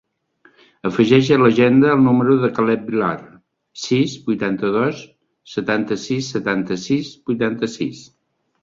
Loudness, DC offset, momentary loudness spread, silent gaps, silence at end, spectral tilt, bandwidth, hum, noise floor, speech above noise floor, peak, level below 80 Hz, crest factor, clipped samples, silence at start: -18 LUFS; under 0.1%; 13 LU; none; 0.6 s; -6.5 dB/octave; 7.6 kHz; none; -56 dBFS; 39 dB; -2 dBFS; -56 dBFS; 18 dB; under 0.1%; 0.85 s